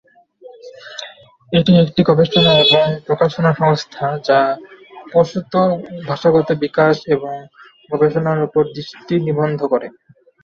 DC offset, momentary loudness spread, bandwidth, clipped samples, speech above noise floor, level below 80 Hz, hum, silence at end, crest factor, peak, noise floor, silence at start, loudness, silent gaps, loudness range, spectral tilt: under 0.1%; 16 LU; 7.4 kHz; under 0.1%; 28 dB; -52 dBFS; none; 0.55 s; 16 dB; 0 dBFS; -43 dBFS; 0.45 s; -15 LUFS; none; 4 LU; -7 dB/octave